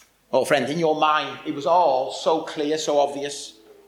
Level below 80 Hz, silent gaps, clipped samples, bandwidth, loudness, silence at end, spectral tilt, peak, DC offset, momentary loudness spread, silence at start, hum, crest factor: -70 dBFS; none; under 0.1%; 16.5 kHz; -22 LUFS; 0.35 s; -4 dB/octave; -4 dBFS; under 0.1%; 11 LU; 0.3 s; none; 18 dB